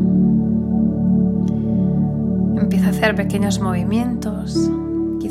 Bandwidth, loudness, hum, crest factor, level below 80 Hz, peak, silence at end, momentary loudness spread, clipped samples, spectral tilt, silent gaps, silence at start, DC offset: 13 kHz; -18 LUFS; none; 16 dB; -36 dBFS; -2 dBFS; 0 s; 6 LU; under 0.1%; -7.5 dB/octave; none; 0 s; under 0.1%